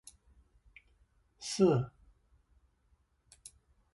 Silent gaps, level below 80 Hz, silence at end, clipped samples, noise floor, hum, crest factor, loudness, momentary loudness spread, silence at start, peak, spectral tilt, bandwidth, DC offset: none; -66 dBFS; 2.05 s; under 0.1%; -73 dBFS; none; 24 dB; -32 LUFS; 26 LU; 1.4 s; -14 dBFS; -6 dB/octave; 11.5 kHz; under 0.1%